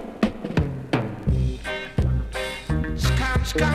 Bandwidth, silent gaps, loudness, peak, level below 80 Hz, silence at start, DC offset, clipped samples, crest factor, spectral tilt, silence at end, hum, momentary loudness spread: 14.5 kHz; none; -25 LUFS; -6 dBFS; -28 dBFS; 0 s; under 0.1%; under 0.1%; 16 dB; -6 dB/octave; 0 s; none; 5 LU